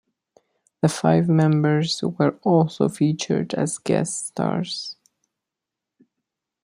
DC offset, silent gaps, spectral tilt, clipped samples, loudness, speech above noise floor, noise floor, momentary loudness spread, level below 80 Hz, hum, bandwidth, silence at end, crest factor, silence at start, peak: under 0.1%; none; -6 dB/octave; under 0.1%; -21 LUFS; 65 dB; -86 dBFS; 8 LU; -64 dBFS; none; 11.5 kHz; 1.7 s; 18 dB; 0.85 s; -4 dBFS